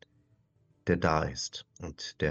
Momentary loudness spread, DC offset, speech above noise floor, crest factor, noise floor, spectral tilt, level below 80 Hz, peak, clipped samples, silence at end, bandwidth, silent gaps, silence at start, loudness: 14 LU; under 0.1%; 38 dB; 22 dB; -69 dBFS; -5 dB/octave; -50 dBFS; -10 dBFS; under 0.1%; 0 s; 8.2 kHz; none; 0.85 s; -32 LUFS